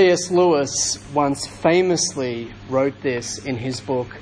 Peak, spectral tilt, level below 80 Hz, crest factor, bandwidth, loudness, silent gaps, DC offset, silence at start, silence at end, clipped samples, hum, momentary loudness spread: -4 dBFS; -4 dB/octave; -50 dBFS; 16 dB; 10.5 kHz; -20 LUFS; none; under 0.1%; 0 s; 0 s; under 0.1%; none; 9 LU